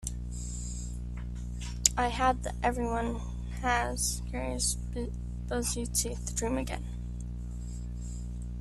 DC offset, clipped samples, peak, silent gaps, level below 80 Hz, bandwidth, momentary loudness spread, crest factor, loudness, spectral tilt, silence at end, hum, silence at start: under 0.1%; under 0.1%; -4 dBFS; none; -38 dBFS; 14 kHz; 12 LU; 30 dB; -33 LUFS; -3.5 dB/octave; 0 s; 60 Hz at -35 dBFS; 0 s